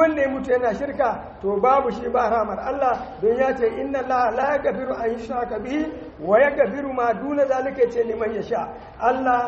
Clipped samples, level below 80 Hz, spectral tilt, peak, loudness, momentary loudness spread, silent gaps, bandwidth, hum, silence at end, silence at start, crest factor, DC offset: under 0.1%; -48 dBFS; -4.5 dB/octave; -4 dBFS; -22 LUFS; 8 LU; none; 7.6 kHz; none; 0 s; 0 s; 16 dB; under 0.1%